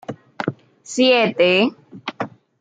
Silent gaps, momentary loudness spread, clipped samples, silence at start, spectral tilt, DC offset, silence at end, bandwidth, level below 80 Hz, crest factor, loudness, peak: none; 18 LU; under 0.1%; 0.1 s; -4.5 dB/octave; under 0.1%; 0.35 s; 9.2 kHz; -72 dBFS; 16 dB; -18 LUFS; -4 dBFS